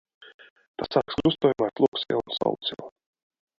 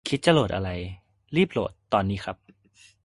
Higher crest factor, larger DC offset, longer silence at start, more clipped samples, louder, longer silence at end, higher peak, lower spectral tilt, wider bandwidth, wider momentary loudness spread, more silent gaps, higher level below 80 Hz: about the same, 20 dB vs 20 dB; neither; first, 0.2 s vs 0.05 s; neither; about the same, -26 LUFS vs -25 LUFS; about the same, 0.7 s vs 0.7 s; about the same, -8 dBFS vs -6 dBFS; about the same, -7 dB/octave vs -6 dB/octave; second, 7.4 kHz vs 11.5 kHz; about the same, 17 LU vs 15 LU; first, 0.34-0.39 s, 0.50-0.56 s, 0.68-0.74 s, 1.88-1.92 s vs none; second, -58 dBFS vs -46 dBFS